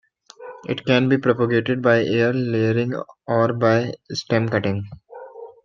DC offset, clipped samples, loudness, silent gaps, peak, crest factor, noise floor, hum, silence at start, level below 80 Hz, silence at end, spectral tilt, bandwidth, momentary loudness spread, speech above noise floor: under 0.1%; under 0.1%; -20 LUFS; none; -2 dBFS; 18 dB; -41 dBFS; none; 0.4 s; -60 dBFS; 0.15 s; -7 dB/octave; 7.2 kHz; 20 LU; 21 dB